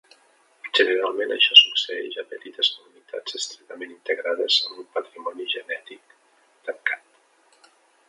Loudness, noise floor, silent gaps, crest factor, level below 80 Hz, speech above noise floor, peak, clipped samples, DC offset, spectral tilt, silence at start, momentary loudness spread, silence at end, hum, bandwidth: -20 LUFS; -60 dBFS; none; 24 dB; -88 dBFS; 36 dB; 0 dBFS; under 0.1%; under 0.1%; 1 dB/octave; 0.65 s; 24 LU; 1.1 s; none; 11.5 kHz